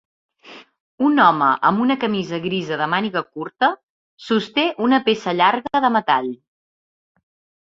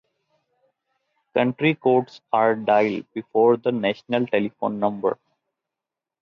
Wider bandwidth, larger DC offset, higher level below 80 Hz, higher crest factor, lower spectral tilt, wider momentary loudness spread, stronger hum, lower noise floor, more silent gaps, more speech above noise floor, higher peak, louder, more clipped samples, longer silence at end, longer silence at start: first, 7.6 kHz vs 6.8 kHz; neither; first, -64 dBFS vs -70 dBFS; about the same, 18 dB vs 16 dB; second, -6 dB/octave vs -8 dB/octave; about the same, 10 LU vs 8 LU; neither; second, -44 dBFS vs -87 dBFS; first, 0.80-0.98 s, 3.83-4.17 s vs none; second, 26 dB vs 66 dB; first, -2 dBFS vs -6 dBFS; first, -19 LUFS vs -22 LUFS; neither; first, 1.3 s vs 1.1 s; second, 0.45 s vs 1.35 s